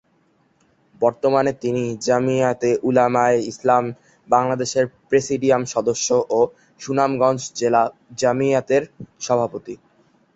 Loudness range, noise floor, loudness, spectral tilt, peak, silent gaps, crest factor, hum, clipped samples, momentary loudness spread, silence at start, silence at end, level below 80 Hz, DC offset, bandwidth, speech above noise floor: 1 LU; -61 dBFS; -20 LUFS; -5 dB/octave; -2 dBFS; none; 18 dB; none; under 0.1%; 7 LU; 1 s; 0.6 s; -60 dBFS; under 0.1%; 8.2 kHz; 42 dB